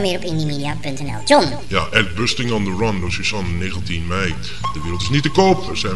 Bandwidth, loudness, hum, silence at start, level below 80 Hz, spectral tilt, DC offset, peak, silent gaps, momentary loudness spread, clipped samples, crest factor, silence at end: 11.5 kHz; -19 LUFS; none; 0 s; -36 dBFS; -5 dB/octave; 5%; 0 dBFS; none; 10 LU; under 0.1%; 20 dB; 0 s